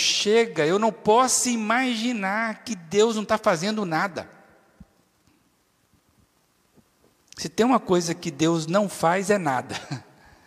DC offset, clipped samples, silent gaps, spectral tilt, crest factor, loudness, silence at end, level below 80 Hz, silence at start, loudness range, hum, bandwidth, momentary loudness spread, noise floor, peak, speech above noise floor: under 0.1%; under 0.1%; none; -3.5 dB/octave; 18 dB; -23 LUFS; 0.45 s; -64 dBFS; 0 s; 10 LU; none; 15.5 kHz; 12 LU; -66 dBFS; -6 dBFS; 43 dB